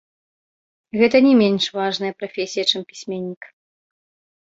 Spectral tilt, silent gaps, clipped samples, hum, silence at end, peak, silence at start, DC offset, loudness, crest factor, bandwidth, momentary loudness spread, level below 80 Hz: -4.5 dB/octave; 3.37-3.41 s; under 0.1%; none; 0.95 s; -2 dBFS; 0.95 s; under 0.1%; -19 LUFS; 20 dB; 7.8 kHz; 16 LU; -64 dBFS